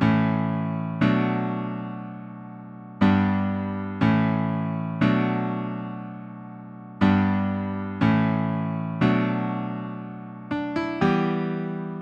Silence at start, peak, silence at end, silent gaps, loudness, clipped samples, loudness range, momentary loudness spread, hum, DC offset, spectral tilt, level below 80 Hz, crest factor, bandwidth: 0 s; -6 dBFS; 0 s; none; -24 LUFS; under 0.1%; 2 LU; 17 LU; none; under 0.1%; -9 dB/octave; -54 dBFS; 18 dB; 7 kHz